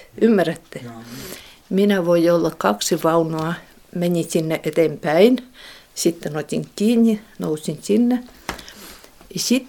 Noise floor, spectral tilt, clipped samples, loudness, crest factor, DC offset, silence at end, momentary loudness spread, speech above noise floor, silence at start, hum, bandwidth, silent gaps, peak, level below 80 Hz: -42 dBFS; -5 dB/octave; under 0.1%; -19 LUFS; 20 dB; under 0.1%; 0 s; 19 LU; 23 dB; 0.15 s; none; 18 kHz; none; 0 dBFS; -54 dBFS